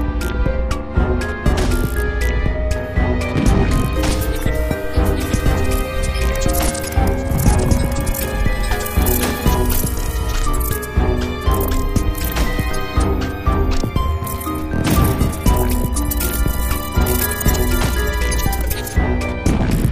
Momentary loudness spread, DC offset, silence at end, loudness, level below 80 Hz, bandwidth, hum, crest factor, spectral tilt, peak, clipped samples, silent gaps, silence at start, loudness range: 4 LU; under 0.1%; 0 s; -19 LUFS; -20 dBFS; 16 kHz; none; 16 dB; -5.5 dB/octave; 0 dBFS; under 0.1%; none; 0 s; 2 LU